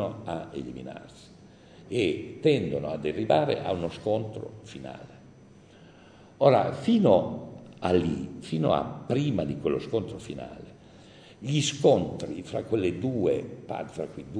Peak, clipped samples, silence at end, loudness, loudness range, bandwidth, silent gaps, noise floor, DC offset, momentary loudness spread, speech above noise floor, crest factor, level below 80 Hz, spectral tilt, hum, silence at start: -4 dBFS; under 0.1%; 0 s; -27 LUFS; 5 LU; 10 kHz; none; -53 dBFS; under 0.1%; 18 LU; 25 dB; 24 dB; -58 dBFS; -6 dB/octave; none; 0 s